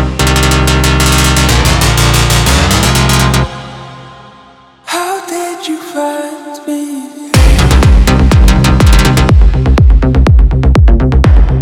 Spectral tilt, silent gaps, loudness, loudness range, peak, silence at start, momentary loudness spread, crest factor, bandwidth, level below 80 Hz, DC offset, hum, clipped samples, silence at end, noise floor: -5 dB/octave; none; -9 LUFS; 11 LU; 0 dBFS; 0 s; 12 LU; 8 dB; 18 kHz; -10 dBFS; under 0.1%; none; 3%; 0 s; -39 dBFS